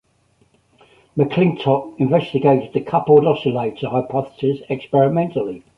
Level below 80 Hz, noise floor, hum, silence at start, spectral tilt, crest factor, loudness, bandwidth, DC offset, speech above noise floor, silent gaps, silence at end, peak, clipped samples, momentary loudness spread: -56 dBFS; -60 dBFS; none; 1.15 s; -9.5 dB/octave; 16 dB; -18 LUFS; 5.6 kHz; under 0.1%; 42 dB; none; 0.2 s; -2 dBFS; under 0.1%; 9 LU